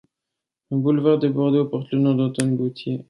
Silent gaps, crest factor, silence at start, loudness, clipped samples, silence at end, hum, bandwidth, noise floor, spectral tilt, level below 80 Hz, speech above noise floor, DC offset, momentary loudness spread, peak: none; 16 dB; 0.7 s; -21 LUFS; under 0.1%; 0.05 s; none; 11.5 kHz; -84 dBFS; -7.5 dB/octave; -66 dBFS; 64 dB; under 0.1%; 6 LU; -6 dBFS